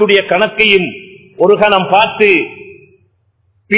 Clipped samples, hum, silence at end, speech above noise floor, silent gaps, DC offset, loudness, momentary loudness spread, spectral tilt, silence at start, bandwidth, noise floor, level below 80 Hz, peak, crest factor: 0.3%; none; 0 s; 48 dB; none; under 0.1%; -10 LUFS; 11 LU; -8 dB/octave; 0 s; 4 kHz; -58 dBFS; -52 dBFS; 0 dBFS; 12 dB